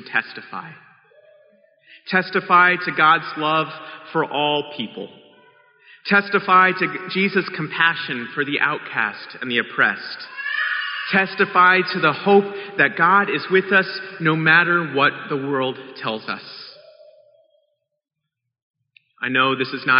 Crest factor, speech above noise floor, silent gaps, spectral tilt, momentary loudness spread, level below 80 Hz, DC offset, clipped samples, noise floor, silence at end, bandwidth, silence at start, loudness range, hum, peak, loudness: 18 dB; 50 dB; 18.62-18.74 s; -2 dB/octave; 16 LU; -74 dBFS; under 0.1%; under 0.1%; -69 dBFS; 0 s; 5.6 kHz; 0 s; 9 LU; none; -2 dBFS; -19 LUFS